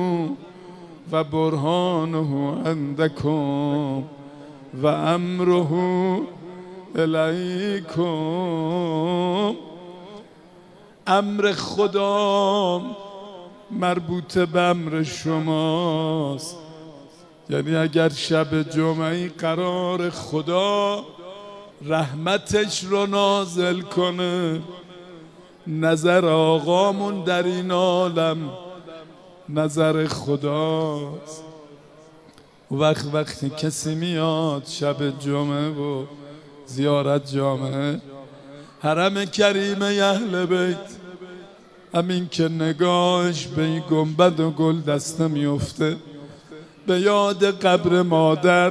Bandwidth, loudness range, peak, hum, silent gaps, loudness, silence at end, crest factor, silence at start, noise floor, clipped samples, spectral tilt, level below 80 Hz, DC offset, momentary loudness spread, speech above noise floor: 11 kHz; 4 LU; -4 dBFS; none; none; -22 LUFS; 0 s; 20 dB; 0 s; -50 dBFS; under 0.1%; -5.5 dB/octave; -60 dBFS; under 0.1%; 20 LU; 29 dB